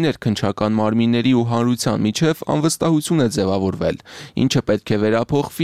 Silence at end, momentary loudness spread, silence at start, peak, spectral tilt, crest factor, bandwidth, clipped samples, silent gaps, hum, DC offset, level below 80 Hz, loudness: 0 s; 4 LU; 0 s; -4 dBFS; -5.5 dB/octave; 14 dB; 15.5 kHz; under 0.1%; none; none; 0.3%; -48 dBFS; -19 LUFS